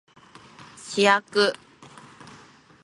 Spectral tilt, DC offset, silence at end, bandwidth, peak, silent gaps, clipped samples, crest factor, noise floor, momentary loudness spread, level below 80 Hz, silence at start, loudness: -3 dB/octave; under 0.1%; 1.3 s; 11.5 kHz; -4 dBFS; none; under 0.1%; 22 dB; -51 dBFS; 26 LU; -72 dBFS; 0.85 s; -22 LUFS